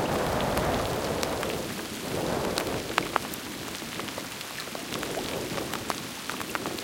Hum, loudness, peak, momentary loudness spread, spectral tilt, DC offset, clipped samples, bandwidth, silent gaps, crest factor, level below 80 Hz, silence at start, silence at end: none; -31 LUFS; -2 dBFS; 7 LU; -3.5 dB/octave; under 0.1%; under 0.1%; 17 kHz; none; 28 dB; -48 dBFS; 0 s; 0 s